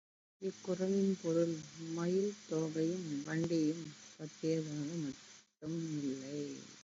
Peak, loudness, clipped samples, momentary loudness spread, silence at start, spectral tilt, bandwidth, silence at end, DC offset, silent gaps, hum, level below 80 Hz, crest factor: -22 dBFS; -38 LUFS; under 0.1%; 12 LU; 0.4 s; -7 dB/octave; 7.6 kHz; 0 s; under 0.1%; none; none; -80 dBFS; 16 dB